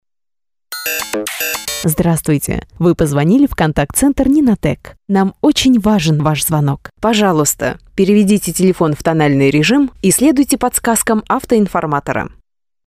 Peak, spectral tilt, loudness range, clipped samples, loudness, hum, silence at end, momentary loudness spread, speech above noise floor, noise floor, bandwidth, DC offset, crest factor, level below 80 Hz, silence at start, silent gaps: -2 dBFS; -5 dB/octave; 2 LU; under 0.1%; -14 LUFS; none; 0.6 s; 8 LU; over 77 dB; under -90 dBFS; 16 kHz; under 0.1%; 12 dB; -36 dBFS; 0.7 s; none